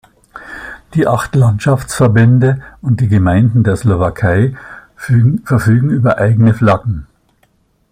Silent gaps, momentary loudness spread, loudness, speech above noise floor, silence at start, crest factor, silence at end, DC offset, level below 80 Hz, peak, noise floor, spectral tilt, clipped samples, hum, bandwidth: none; 13 LU; -12 LUFS; 45 dB; 0.35 s; 12 dB; 0.9 s; under 0.1%; -38 dBFS; 0 dBFS; -56 dBFS; -8 dB/octave; under 0.1%; none; 15 kHz